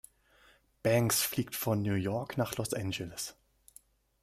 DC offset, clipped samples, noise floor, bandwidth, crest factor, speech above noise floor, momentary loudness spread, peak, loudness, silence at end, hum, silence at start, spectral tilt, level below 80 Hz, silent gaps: under 0.1%; under 0.1%; -65 dBFS; 16 kHz; 20 dB; 33 dB; 10 LU; -14 dBFS; -32 LUFS; 0.9 s; none; 0.85 s; -4.5 dB/octave; -64 dBFS; none